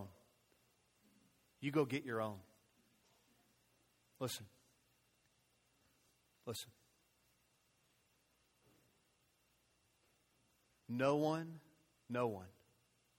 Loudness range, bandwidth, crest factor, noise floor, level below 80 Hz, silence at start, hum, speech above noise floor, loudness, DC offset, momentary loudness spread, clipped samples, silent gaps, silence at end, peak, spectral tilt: 14 LU; 16.5 kHz; 24 dB; -78 dBFS; -84 dBFS; 0 s; 60 Hz at -80 dBFS; 38 dB; -41 LUFS; under 0.1%; 19 LU; under 0.1%; none; 0.7 s; -22 dBFS; -5.5 dB/octave